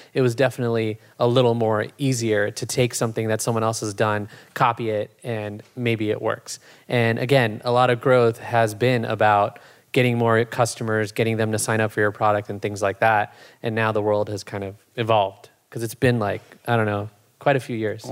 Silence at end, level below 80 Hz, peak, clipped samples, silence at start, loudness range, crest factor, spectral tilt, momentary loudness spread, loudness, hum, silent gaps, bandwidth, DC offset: 0 s; -66 dBFS; -4 dBFS; under 0.1%; 0.15 s; 4 LU; 18 dB; -5.5 dB/octave; 11 LU; -22 LUFS; none; none; 16 kHz; under 0.1%